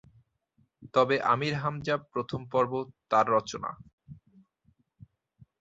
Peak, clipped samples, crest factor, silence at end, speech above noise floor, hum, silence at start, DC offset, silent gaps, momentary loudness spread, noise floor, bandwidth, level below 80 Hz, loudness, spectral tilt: -10 dBFS; under 0.1%; 20 dB; 1.45 s; 43 dB; none; 0.8 s; under 0.1%; 3.93-3.98 s; 12 LU; -71 dBFS; 7.8 kHz; -64 dBFS; -29 LUFS; -5.5 dB/octave